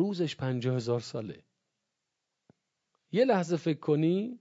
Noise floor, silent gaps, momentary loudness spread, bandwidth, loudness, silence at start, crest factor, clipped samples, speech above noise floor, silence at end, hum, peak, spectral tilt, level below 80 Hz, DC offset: -85 dBFS; none; 10 LU; 8 kHz; -30 LUFS; 0 s; 18 dB; under 0.1%; 56 dB; 0.05 s; none; -14 dBFS; -7 dB/octave; -74 dBFS; under 0.1%